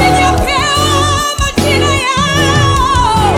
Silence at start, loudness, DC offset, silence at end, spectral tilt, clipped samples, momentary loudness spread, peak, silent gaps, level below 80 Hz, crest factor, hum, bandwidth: 0 s; -11 LUFS; under 0.1%; 0 s; -4 dB/octave; under 0.1%; 3 LU; 0 dBFS; none; -22 dBFS; 10 dB; none; 17 kHz